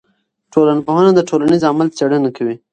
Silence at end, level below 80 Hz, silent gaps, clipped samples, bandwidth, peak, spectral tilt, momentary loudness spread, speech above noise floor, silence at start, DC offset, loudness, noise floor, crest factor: 0.15 s; -58 dBFS; none; under 0.1%; 9.2 kHz; 0 dBFS; -7 dB/octave; 7 LU; 40 dB; 0.55 s; under 0.1%; -14 LUFS; -53 dBFS; 14 dB